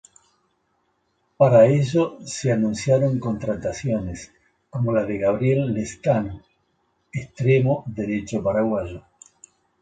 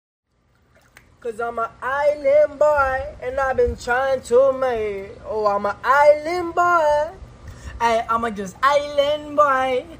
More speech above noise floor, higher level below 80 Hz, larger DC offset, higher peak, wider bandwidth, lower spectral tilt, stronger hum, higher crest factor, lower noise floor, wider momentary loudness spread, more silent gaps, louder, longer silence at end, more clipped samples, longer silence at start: first, 48 dB vs 42 dB; second, -50 dBFS vs -44 dBFS; neither; about the same, -2 dBFS vs -2 dBFS; second, 9.2 kHz vs 16 kHz; first, -7 dB/octave vs -4.5 dB/octave; neither; about the same, 20 dB vs 18 dB; first, -69 dBFS vs -61 dBFS; first, 17 LU vs 12 LU; neither; about the same, -21 LUFS vs -19 LUFS; first, 0.8 s vs 0 s; neither; first, 1.4 s vs 1.25 s